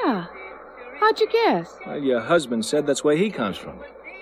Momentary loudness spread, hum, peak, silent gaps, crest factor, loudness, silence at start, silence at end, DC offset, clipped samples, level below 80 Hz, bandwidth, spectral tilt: 19 LU; none; -6 dBFS; none; 16 dB; -22 LUFS; 0 s; 0 s; under 0.1%; under 0.1%; -60 dBFS; 13 kHz; -4.5 dB/octave